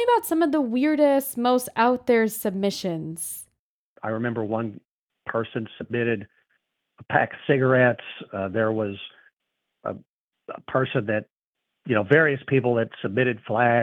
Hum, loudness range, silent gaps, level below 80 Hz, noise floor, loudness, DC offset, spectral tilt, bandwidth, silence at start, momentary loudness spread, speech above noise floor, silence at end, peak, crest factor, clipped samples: none; 7 LU; 3.59-3.96 s, 4.91-5.08 s, 9.33-9.37 s, 10.09-10.31 s, 11.43-11.53 s; -68 dBFS; -82 dBFS; -24 LUFS; under 0.1%; -6 dB/octave; 20 kHz; 0 s; 15 LU; 59 dB; 0 s; -4 dBFS; 20 dB; under 0.1%